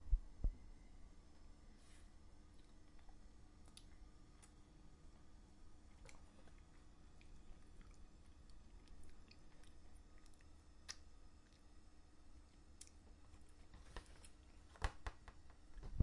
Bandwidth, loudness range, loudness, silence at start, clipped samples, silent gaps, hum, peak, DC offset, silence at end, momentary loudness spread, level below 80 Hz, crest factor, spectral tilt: 11 kHz; 9 LU; -60 LUFS; 0 s; under 0.1%; none; none; -22 dBFS; under 0.1%; 0 s; 18 LU; -54 dBFS; 30 dB; -5 dB/octave